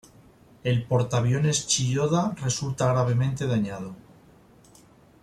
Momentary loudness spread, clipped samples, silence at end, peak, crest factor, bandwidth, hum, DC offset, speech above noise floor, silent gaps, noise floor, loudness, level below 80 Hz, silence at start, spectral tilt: 7 LU; under 0.1%; 1.25 s; -10 dBFS; 16 dB; 13 kHz; none; under 0.1%; 30 dB; none; -54 dBFS; -25 LUFS; -56 dBFS; 0.65 s; -5 dB/octave